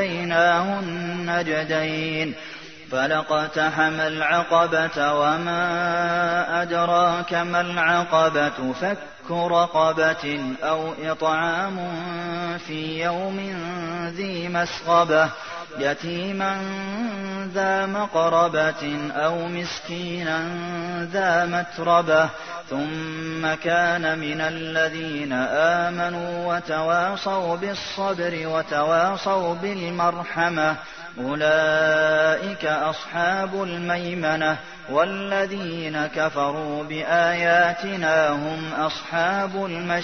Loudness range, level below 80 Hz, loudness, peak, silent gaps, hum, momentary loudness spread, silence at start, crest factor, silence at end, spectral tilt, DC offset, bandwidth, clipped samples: 3 LU; -60 dBFS; -23 LUFS; -6 dBFS; none; none; 10 LU; 0 s; 18 dB; 0 s; -5 dB/octave; 0.2%; 6.6 kHz; under 0.1%